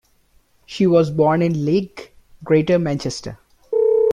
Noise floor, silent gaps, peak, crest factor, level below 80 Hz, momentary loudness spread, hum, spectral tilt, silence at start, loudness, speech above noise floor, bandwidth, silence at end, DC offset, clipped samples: -58 dBFS; none; -4 dBFS; 14 dB; -52 dBFS; 18 LU; none; -7 dB/octave; 0.7 s; -18 LUFS; 40 dB; 11 kHz; 0 s; under 0.1%; under 0.1%